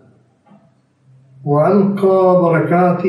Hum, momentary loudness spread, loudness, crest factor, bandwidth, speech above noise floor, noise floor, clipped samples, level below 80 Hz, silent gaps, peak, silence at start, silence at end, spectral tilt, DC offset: none; 5 LU; -13 LUFS; 12 dB; 11 kHz; 42 dB; -54 dBFS; under 0.1%; -64 dBFS; none; -2 dBFS; 1.45 s; 0 s; -10 dB/octave; under 0.1%